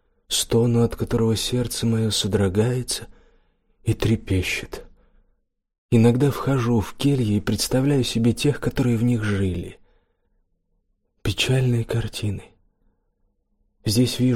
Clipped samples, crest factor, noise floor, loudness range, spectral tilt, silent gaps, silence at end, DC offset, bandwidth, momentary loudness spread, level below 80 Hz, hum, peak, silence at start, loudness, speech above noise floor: under 0.1%; 16 dB; -69 dBFS; 6 LU; -5.5 dB/octave; 5.78-5.89 s; 0 s; under 0.1%; 16 kHz; 9 LU; -42 dBFS; none; -6 dBFS; 0.3 s; -22 LUFS; 48 dB